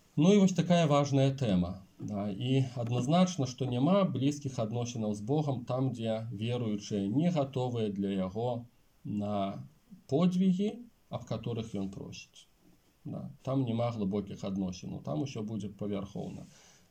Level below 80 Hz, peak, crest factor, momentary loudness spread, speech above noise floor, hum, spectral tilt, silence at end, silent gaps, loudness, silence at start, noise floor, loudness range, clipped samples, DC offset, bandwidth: -68 dBFS; -14 dBFS; 18 dB; 15 LU; 34 dB; none; -7 dB/octave; 0.45 s; none; -32 LUFS; 0.15 s; -65 dBFS; 7 LU; under 0.1%; under 0.1%; 9 kHz